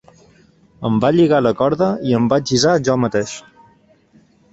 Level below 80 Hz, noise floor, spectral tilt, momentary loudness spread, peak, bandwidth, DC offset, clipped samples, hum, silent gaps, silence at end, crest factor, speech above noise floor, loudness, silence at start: -52 dBFS; -53 dBFS; -5.5 dB/octave; 10 LU; -2 dBFS; 8.2 kHz; under 0.1%; under 0.1%; none; none; 1.15 s; 16 dB; 37 dB; -16 LUFS; 0.8 s